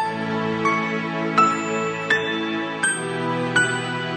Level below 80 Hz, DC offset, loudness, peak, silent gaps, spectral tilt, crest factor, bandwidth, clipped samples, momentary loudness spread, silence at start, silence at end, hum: -62 dBFS; under 0.1%; -22 LUFS; -6 dBFS; none; -4 dB/octave; 18 dB; 9.4 kHz; under 0.1%; 6 LU; 0 s; 0 s; none